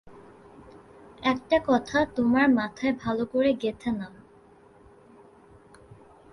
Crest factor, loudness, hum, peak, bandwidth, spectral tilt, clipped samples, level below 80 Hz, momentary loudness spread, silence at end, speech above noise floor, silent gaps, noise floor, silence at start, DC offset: 18 dB; -25 LUFS; none; -10 dBFS; 11 kHz; -6 dB/octave; under 0.1%; -56 dBFS; 10 LU; 2.25 s; 30 dB; none; -55 dBFS; 0.05 s; under 0.1%